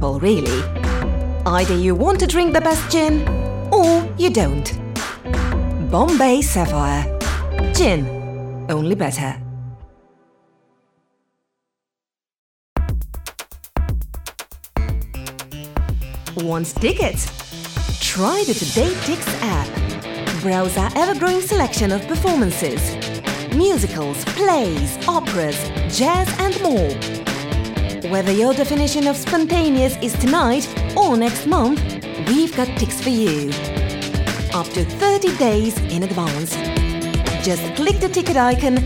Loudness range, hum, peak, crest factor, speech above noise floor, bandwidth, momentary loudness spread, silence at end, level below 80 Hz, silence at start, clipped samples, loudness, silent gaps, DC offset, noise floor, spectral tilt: 10 LU; none; -2 dBFS; 16 dB; over 73 dB; 18.5 kHz; 10 LU; 0 s; -26 dBFS; 0 s; under 0.1%; -19 LUFS; 12.38-12.76 s; under 0.1%; under -90 dBFS; -5 dB/octave